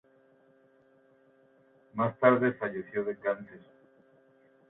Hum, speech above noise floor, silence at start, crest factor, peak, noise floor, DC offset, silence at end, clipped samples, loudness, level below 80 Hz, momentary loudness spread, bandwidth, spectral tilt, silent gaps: none; 35 dB; 1.95 s; 24 dB; -10 dBFS; -64 dBFS; under 0.1%; 1.1 s; under 0.1%; -29 LUFS; -76 dBFS; 15 LU; 4 kHz; -10.5 dB/octave; none